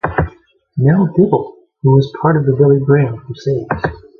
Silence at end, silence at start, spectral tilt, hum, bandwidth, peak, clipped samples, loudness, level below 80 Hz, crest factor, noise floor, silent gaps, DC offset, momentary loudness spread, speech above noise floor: 0.2 s; 0.05 s; -10 dB/octave; none; 6.2 kHz; 0 dBFS; under 0.1%; -14 LUFS; -36 dBFS; 14 dB; -43 dBFS; none; under 0.1%; 10 LU; 30 dB